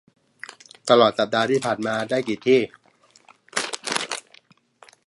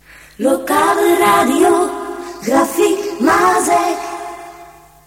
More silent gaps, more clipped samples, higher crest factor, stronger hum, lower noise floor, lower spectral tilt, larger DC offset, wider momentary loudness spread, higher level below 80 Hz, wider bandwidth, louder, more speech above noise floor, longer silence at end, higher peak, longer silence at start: neither; neither; first, 24 dB vs 14 dB; neither; first, -56 dBFS vs -40 dBFS; about the same, -3.5 dB/octave vs -3.5 dB/octave; neither; first, 20 LU vs 14 LU; second, -68 dBFS vs -50 dBFS; second, 11.5 kHz vs 16.5 kHz; second, -22 LUFS vs -14 LUFS; first, 36 dB vs 27 dB; first, 0.85 s vs 0.35 s; about the same, 0 dBFS vs -2 dBFS; first, 0.85 s vs 0.4 s